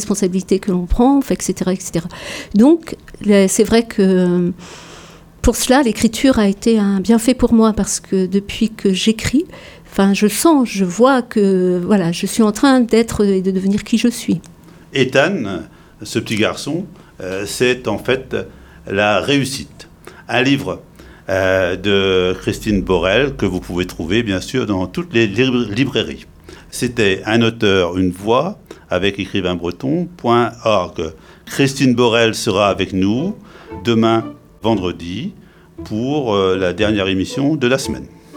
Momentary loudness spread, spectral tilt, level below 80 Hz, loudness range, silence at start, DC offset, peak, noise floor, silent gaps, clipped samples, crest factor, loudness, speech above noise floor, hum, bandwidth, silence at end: 12 LU; -5 dB/octave; -36 dBFS; 4 LU; 0 s; under 0.1%; 0 dBFS; -40 dBFS; none; under 0.1%; 16 dB; -16 LUFS; 24 dB; none; 18.5 kHz; 0 s